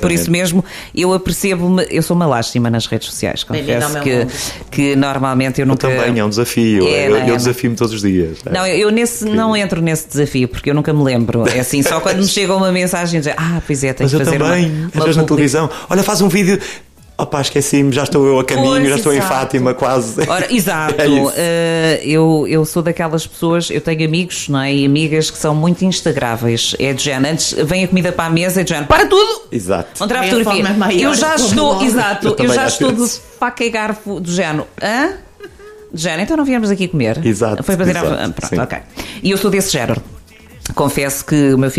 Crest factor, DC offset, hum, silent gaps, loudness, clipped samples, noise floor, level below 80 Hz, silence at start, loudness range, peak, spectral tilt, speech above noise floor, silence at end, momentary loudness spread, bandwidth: 14 dB; under 0.1%; none; none; -14 LUFS; under 0.1%; -35 dBFS; -40 dBFS; 0 s; 3 LU; 0 dBFS; -5 dB/octave; 21 dB; 0 s; 7 LU; 15.5 kHz